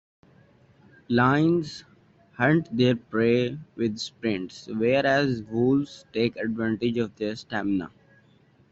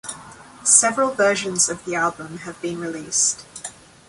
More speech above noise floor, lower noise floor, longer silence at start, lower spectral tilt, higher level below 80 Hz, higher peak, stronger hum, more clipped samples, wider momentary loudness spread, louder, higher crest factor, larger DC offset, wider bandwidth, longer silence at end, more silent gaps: first, 35 dB vs 21 dB; first, -59 dBFS vs -42 dBFS; first, 1.1 s vs 0.05 s; first, -7 dB/octave vs -1.5 dB/octave; about the same, -62 dBFS vs -60 dBFS; second, -6 dBFS vs 0 dBFS; neither; neither; second, 10 LU vs 21 LU; second, -25 LUFS vs -19 LUFS; about the same, 18 dB vs 22 dB; neither; second, 8 kHz vs 11.5 kHz; first, 0.85 s vs 0.35 s; neither